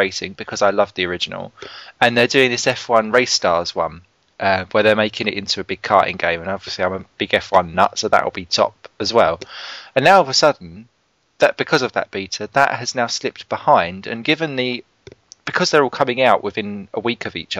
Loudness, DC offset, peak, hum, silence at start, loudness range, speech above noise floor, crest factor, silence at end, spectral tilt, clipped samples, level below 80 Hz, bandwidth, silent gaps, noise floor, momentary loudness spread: -18 LUFS; under 0.1%; 0 dBFS; none; 0 s; 3 LU; 26 dB; 18 dB; 0 s; -3.5 dB/octave; under 0.1%; -56 dBFS; 14.5 kHz; none; -45 dBFS; 11 LU